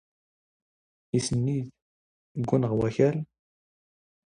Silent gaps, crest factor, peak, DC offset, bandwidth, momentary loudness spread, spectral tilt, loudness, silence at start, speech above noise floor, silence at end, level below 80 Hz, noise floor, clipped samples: 1.82-2.35 s; 22 dB; -8 dBFS; under 0.1%; 10.5 kHz; 16 LU; -6.5 dB/octave; -27 LUFS; 1.15 s; over 65 dB; 1.1 s; -58 dBFS; under -90 dBFS; under 0.1%